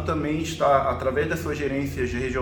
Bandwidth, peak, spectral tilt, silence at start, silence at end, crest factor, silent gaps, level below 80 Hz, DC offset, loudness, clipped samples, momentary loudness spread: 19 kHz; -6 dBFS; -6 dB/octave; 0 s; 0 s; 18 dB; none; -40 dBFS; under 0.1%; -24 LUFS; under 0.1%; 6 LU